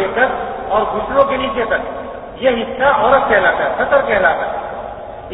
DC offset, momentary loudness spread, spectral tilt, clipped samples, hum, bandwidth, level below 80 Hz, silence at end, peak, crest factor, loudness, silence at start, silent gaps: under 0.1%; 15 LU; -8.5 dB/octave; under 0.1%; none; 4 kHz; -40 dBFS; 0 s; 0 dBFS; 16 dB; -15 LUFS; 0 s; none